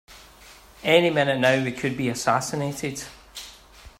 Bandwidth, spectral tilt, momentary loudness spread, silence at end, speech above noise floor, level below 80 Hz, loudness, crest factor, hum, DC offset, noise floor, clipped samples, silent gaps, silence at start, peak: 16 kHz; -4.5 dB/octave; 20 LU; 0.1 s; 26 dB; -54 dBFS; -23 LUFS; 20 dB; none; under 0.1%; -49 dBFS; under 0.1%; none; 0.1 s; -4 dBFS